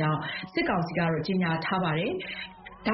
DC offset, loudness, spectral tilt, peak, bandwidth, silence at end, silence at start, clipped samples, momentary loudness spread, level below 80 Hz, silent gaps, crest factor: under 0.1%; -29 LUFS; -4.5 dB/octave; -14 dBFS; 5.8 kHz; 0 s; 0 s; under 0.1%; 8 LU; -56 dBFS; none; 16 dB